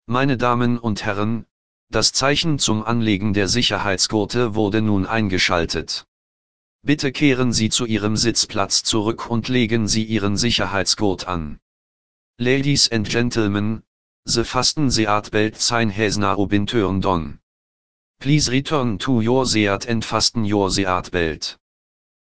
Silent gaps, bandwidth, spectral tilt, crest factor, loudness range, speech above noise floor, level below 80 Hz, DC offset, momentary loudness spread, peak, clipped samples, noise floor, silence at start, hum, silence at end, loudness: 1.51-1.87 s, 6.08-6.79 s, 11.62-12.34 s, 13.87-14.23 s, 17.43-18.14 s; 11 kHz; -4 dB/octave; 18 dB; 2 LU; over 71 dB; -42 dBFS; 2%; 7 LU; -2 dBFS; under 0.1%; under -90 dBFS; 0 s; none; 0.65 s; -19 LUFS